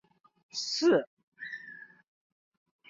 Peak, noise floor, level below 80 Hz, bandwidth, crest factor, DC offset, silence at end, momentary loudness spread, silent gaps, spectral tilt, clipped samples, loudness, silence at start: -14 dBFS; -51 dBFS; -80 dBFS; 7.8 kHz; 20 dB; under 0.1%; 1.05 s; 22 LU; 1.07-1.17 s, 1.23-1.32 s; -3.5 dB/octave; under 0.1%; -30 LUFS; 0.55 s